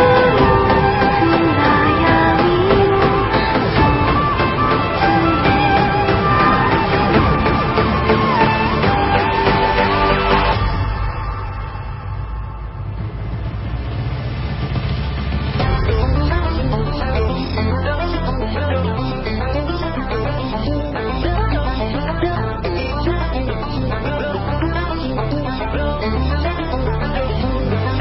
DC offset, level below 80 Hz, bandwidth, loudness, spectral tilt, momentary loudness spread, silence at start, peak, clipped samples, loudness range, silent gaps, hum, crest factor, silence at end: under 0.1%; -24 dBFS; 5.8 kHz; -17 LUFS; -11 dB/octave; 10 LU; 0 s; 0 dBFS; under 0.1%; 8 LU; none; none; 16 dB; 0 s